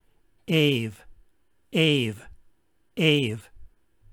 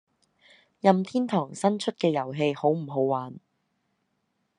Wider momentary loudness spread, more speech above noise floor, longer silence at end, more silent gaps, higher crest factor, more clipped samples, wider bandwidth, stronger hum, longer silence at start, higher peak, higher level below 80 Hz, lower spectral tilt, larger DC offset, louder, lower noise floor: first, 18 LU vs 5 LU; second, 43 dB vs 50 dB; second, 0.45 s vs 1.2 s; neither; about the same, 22 dB vs 24 dB; neither; first, 16.5 kHz vs 11 kHz; neither; second, 0.5 s vs 0.85 s; about the same, -6 dBFS vs -4 dBFS; first, -58 dBFS vs -78 dBFS; about the same, -5.5 dB/octave vs -6.5 dB/octave; neither; about the same, -24 LUFS vs -26 LUFS; second, -66 dBFS vs -75 dBFS